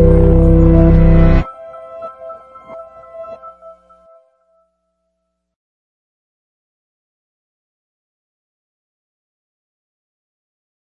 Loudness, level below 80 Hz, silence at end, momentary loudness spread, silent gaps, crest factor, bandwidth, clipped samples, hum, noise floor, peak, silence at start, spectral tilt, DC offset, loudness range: -10 LUFS; -20 dBFS; 7.3 s; 25 LU; none; 16 dB; 4.3 kHz; under 0.1%; none; -72 dBFS; 0 dBFS; 0 s; -11 dB/octave; under 0.1%; 25 LU